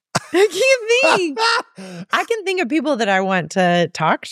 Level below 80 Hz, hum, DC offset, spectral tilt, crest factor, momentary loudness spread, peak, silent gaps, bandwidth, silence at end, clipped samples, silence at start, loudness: -68 dBFS; none; under 0.1%; -4 dB/octave; 16 dB; 7 LU; -2 dBFS; none; 15 kHz; 0 s; under 0.1%; 0.15 s; -17 LUFS